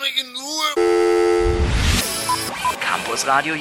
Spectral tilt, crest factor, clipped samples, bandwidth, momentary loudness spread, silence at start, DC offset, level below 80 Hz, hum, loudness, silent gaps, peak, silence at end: -3.5 dB/octave; 16 dB; under 0.1%; 17.5 kHz; 5 LU; 0 s; under 0.1%; -28 dBFS; none; -19 LUFS; none; -4 dBFS; 0 s